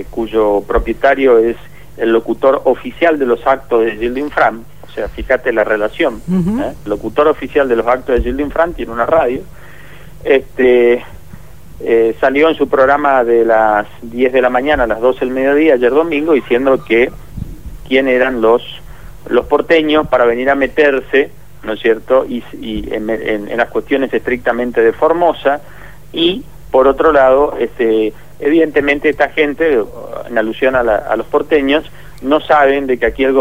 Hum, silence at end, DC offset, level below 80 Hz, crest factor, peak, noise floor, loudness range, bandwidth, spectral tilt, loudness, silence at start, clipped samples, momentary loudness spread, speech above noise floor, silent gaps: 50 Hz at -40 dBFS; 0 s; 2%; -34 dBFS; 14 dB; 0 dBFS; -36 dBFS; 3 LU; 16 kHz; -6.5 dB/octave; -13 LUFS; 0 s; under 0.1%; 10 LU; 24 dB; none